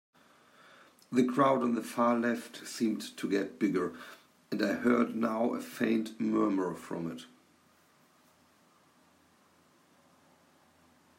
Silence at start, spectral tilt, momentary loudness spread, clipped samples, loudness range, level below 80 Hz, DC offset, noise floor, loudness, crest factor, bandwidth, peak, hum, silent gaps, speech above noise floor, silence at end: 1.1 s; -5.5 dB/octave; 12 LU; under 0.1%; 7 LU; -80 dBFS; under 0.1%; -66 dBFS; -31 LUFS; 20 dB; 16 kHz; -14 dBFS; none; none; 35 dB; 3.9 s